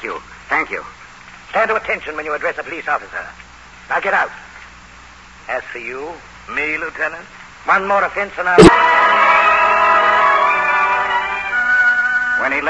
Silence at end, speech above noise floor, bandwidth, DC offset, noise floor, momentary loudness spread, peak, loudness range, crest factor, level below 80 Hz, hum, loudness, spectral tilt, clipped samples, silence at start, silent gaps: 0 s; 24 dB; 11 kHz; 0.2%; -40 dBFS; 17 LU; 0 dBFS; 12 LU; 16 dB; -40 dBFS; none; -14 LUFS; -5 dB/octave; 0.4%; 0 s; none